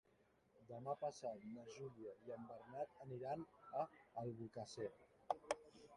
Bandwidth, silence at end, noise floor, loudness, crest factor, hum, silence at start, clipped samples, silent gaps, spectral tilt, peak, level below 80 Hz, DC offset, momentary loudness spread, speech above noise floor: 11 kHz; 0 s; -77 dBFS; -51 LUFS; 28 dB; none; 0.55 s; under 0.1%; none; -5.5 dB/octave; -24 dBFS; -84 dBFS; under 0.1%; 8 LU; 27 dB